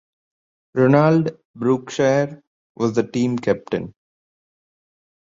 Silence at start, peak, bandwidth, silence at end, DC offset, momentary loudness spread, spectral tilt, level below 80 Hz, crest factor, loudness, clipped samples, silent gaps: 0.75 s; -2 dBFS; 7.8 kHz; 1.35 s; under 0.1%; 13 LU; -7 dB/octave; -58 dBFS; 18 dB; -20 LUFS; under 0.1%; 1.45-1.54 s, 2.47-2.75 s